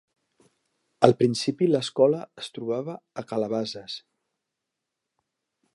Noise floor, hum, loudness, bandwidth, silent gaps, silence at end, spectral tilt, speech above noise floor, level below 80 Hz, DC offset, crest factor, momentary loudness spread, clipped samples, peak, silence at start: -84 dBFS; none; -25 LUFS; 11.5 kHz; none; 1.75 s; -6 dB/octave; 60 dB; -74 dBFS; under 0.1%; 26 dB; 16 LU; under 0.1%; 0 dBFS; 1 s